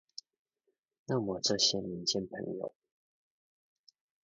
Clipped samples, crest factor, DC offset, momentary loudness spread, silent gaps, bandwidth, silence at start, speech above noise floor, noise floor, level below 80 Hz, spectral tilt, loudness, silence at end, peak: under 0.1%; 24 dB; under 0.1%; 22 LU; none; 7.4 kHz; 1.1 s; 49 dB; -82 dBFS; -70 dBFS; -3.5 dB/octave; -32 LUFS; 1.55 s; -14 dBFS